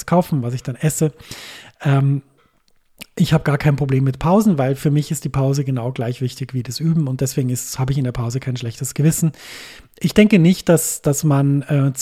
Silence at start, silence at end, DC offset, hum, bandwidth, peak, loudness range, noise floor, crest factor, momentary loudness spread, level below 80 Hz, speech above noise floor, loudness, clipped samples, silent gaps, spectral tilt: 0 s; 0 s; under 0.1%; none; 15.5 kHz; 0 dBFS; 4 LU; -57 dBFS; 18 dB; 10 LU; -44 dBFS; 40 dB; -18 LUFS; under 0.1%; none; -6 dB/octave